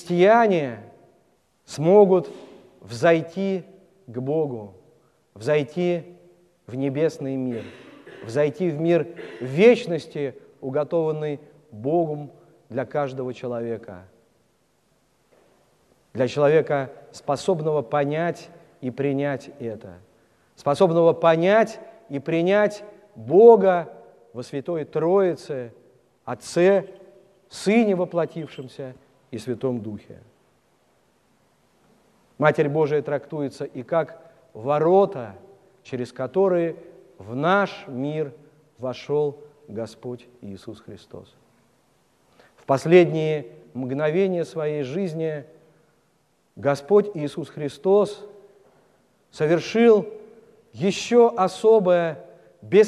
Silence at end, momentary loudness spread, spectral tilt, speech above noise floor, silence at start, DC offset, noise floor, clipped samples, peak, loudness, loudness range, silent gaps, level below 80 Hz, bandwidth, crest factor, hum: 0 s; 21 LU; -7 dB/octave; 44 dB; 0 s; under 0.1%; -66 dBFS; under 0.1%; -2 dBFS; -22 LUFS; 11 LU; none; -70 dBFS; 11.5 kHz; 22 dB; none